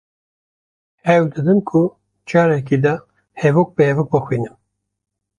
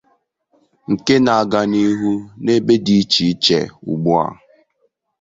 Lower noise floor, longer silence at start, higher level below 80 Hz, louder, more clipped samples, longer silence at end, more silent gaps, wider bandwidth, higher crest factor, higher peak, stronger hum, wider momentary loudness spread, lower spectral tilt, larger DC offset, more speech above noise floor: first, -79 dBFS vs -65 dBFS; first, 1.05 s vs 0.9 s; about the same, -56 dBFS vs -52 dBFS; about the same, -17 LUFS vs -16 LUFS; neither; about the same, 0.9 s vs 0.9 s; neither; first, 9.8 kHz vs 7.8 kHz; about the same, 16 dB vs 16 dB; about the same, -2 dBFS vs 0 dBFS; first, 50 Hz at -45 dBFS vs none; about the same, 8 LU vs 9 LU; first, -8.5 dB/octave vs -5.5 dB/octave; neither; first, 63 dB vs 50 dB